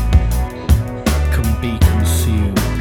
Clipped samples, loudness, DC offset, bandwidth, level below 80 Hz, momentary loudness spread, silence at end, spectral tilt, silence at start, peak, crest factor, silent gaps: under 0.1%; -17 LUFS; under 0.1%; 18.5 kHz; -18 dBFS; 4 LU; 0 s; -6 dB/octave; 0 s; 0 dBFS; 14 dB; none